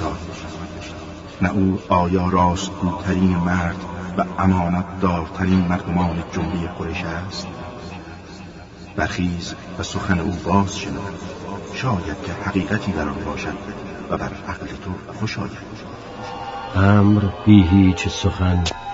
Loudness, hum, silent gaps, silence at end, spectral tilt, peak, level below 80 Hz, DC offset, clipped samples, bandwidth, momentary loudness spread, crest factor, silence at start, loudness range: -21 LUFS; none; none; 0 s; -6.5 dB/octave; 0 dBFS; -38 dBFS; under 0.1%; under 0.1%; 7.8 kHz; 17 LU; 20 dB; 0 s; 10 LU